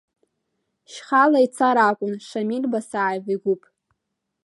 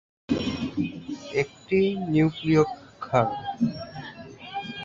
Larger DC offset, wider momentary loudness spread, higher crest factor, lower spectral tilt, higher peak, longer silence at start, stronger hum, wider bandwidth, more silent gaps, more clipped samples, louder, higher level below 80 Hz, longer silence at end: neither; second, 11 LU vs 16 LU; about the same, 18 dB vs 20 dB; second, -5.5 dB/octave vs -7 dB/octave; about the same, -4 dBFS vs -6 dBFS; first, 0.9 s vs 0.3 s; neither; first, 11.5 kHz vs 7.6 kHz; neither; neither; first, -21 LUFS vs -26 LUFS; second, -78 dBFS vs -54 dBFS; first, 0.9 s vs 0 s